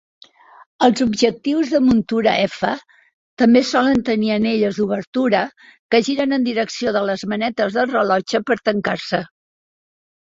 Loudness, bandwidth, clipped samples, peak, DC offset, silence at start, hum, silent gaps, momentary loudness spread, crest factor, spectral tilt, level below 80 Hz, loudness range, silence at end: -18 LUFS; 7.8 kHz; under 0.1%; -2 dBFS; under 0.1%; 0.8 s; none; 3.14-3.37 s, 5.07-5.13 s, 5.79-5.89 s; 7 LU; 18 dB; -5 dB/octave; -54 dBFS; 3 LU; 1 s